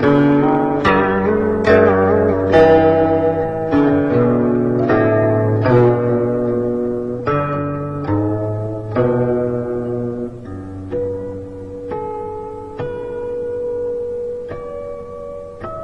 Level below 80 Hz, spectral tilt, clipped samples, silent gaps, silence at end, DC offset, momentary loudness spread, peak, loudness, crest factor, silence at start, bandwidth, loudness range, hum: -40 dBFS; -9 dB/octave; under 0.1%; none; 0 s; 0.4%; 16 LU; 0 dBFS; -16 LUFS; 16 dB; 0 s; 7 kHz; 12 LU; none